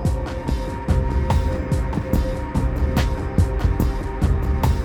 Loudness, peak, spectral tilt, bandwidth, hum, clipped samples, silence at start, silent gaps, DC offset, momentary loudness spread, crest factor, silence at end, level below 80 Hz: -22 LUFS; -6 dBFS; -7.5 dB/octave; 17 kHz; none; under 0.1%; 0 s; none; under 0.1%; 4 LU; 14 dB; 0 s; -22 dBFS